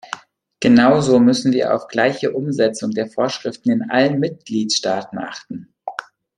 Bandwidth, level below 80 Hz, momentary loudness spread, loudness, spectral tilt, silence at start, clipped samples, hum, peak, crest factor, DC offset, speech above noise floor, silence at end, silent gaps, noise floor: 10.5 kHz; -58 dBFS; 18 LU; -17 LUFS; -5 dB/octave; 0.1 s; under 0.1%; none; -2 dBFS; 16 dB; under 0.1%; 19 dB; 0.35 s; none; -36 dBFS